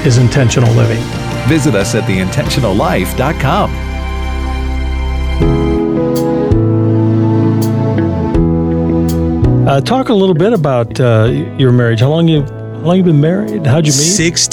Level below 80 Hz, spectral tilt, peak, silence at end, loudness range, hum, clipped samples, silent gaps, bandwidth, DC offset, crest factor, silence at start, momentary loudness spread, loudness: -22 dBFS; -5.5 dB/octave; 0 dBFS; 0 s; 4 LU; none; under 0.1%; none; 16.5 kHz; under 0.1%; 10 dB; 0 s; 8 LU; -12 LUFS